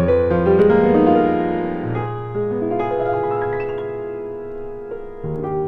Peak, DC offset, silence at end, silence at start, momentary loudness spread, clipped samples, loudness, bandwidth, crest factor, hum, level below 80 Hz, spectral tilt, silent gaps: -2 dBFS; under 0.1%; 0 s; 0 s; 16 LU; under 0.1%; -19 LUFS; 4.7 kHz; 16 dB; none; -40 dBFS; -10 dB/octave; none